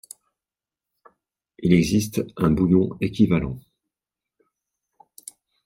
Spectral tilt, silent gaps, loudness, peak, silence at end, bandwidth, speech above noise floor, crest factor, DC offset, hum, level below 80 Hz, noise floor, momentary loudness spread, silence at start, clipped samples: -7 dB/octave; none; -21 LUFS; -4 dBFS; 2.05 s; 16 kHz; 70 dB; 20 dB; under 0.1%; none; -46 dBFS; -90 dBFS; 24 LU; 1.6 s; under 0.1%